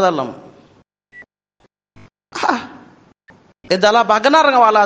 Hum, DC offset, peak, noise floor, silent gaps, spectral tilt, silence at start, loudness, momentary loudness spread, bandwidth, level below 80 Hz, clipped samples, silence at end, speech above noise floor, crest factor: none; under 0.1%; 0 dBFS; -60 dBFS; none; -4 dB/octave; 0 s; -14 LUFS; 17 LU; 9.6 kHz; -62 dBFS; under 0.1%; 0 s; 47 dB; 18 dB